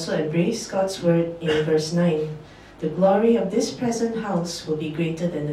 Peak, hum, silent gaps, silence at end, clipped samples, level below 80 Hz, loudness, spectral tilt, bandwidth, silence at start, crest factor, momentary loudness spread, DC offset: -6 dBFS; none; none; 0 s; under 0.1%; -54 dBFS; -23 LUFS; -6 dB/octave; 13.5 kHz; 0 s; 16 dB; 8 LU; under 0.1%